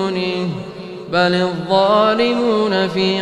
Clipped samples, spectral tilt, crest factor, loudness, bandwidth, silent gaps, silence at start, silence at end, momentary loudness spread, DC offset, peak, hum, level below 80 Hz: under 0.1%; -6 dB/octave; 16 dB; -16 LUFS; 11 kHz; none; 0 s; 0 s; 12 LU; under 0.1%; -2 dBFS; none; -56 dBFS